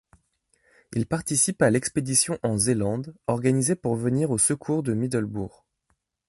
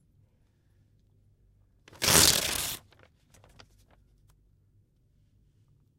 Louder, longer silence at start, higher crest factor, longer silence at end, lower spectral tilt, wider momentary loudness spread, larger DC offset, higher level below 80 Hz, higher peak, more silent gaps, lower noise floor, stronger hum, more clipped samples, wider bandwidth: about the same, -24 LUFS vs -23 LUFS; second, 0.9 s vs 2 s; second, 18 dB vs 30 dB; second, 0.8 s vs 3.2 s; first, -4.5 dB/octave vs -1 dB/octave; second, 9 LU vs 16 LU; neither; about the same, -54 dBFS vs -54 dBFS; second, -6 dBFS vs -2 dBFS; neither; first, -73 dBFS vs -67 dBFS; neither; neither; second, 12 kHz vs 16 kHz